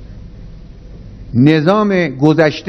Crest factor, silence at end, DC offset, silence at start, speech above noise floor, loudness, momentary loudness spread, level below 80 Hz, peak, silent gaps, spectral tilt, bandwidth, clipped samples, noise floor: 14 dB; 0 s; under 0.1%; 0 s; 22 dB; -12 LUFS; 4 LU; -36 dBFS; 0 dBFS; none; -8 dB/octave; 6.4 kHz; 0.2%; -33 dBFS